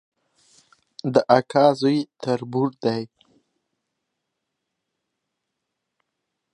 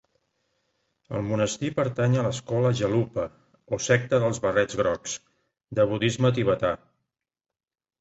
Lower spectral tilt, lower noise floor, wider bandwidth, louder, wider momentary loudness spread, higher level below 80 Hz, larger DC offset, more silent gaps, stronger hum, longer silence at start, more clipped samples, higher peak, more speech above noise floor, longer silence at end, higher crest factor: first, -7 dB/octave vs -5.5 dB/octave; second, -80 dBFS vs under -90 dBFS; first, 10.5 kHz vs 8.2 kHz; first, -21 LUFS vs -25 LUFS; about the same, 12 LU vs 10 LU; second, -72 dBFS vs -56 dBFS; neither; neither; neither; about the same, 1.05 s vs 1.1 s; neither; first, -2 dBFS vs -6 dBFS; second, 60 dB vs over 66 dB; first, 3.5 s vs 1.25 s; about the same, 24 dB vs 20 dB